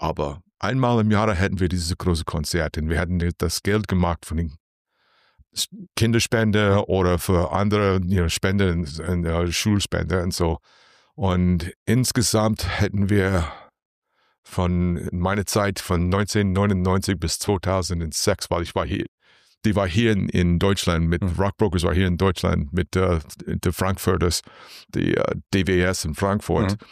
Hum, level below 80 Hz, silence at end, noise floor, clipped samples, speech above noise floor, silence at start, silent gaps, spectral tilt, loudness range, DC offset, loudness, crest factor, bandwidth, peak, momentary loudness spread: none; -36 dBFS; 0.1 s; -63 dBFS; under 0.1%; 42 dB; 0 s; 4.60-4.85 s, 11.76-11.86 s, 13.82-14.02 s, 14.38-14.43 s, 19.08-19.18 s; -5.5 dB/octave; 3 LU; under 0.1%; -22 LUFS; 14 dB; 15.5 kHz; -8 dBFS; 7 LU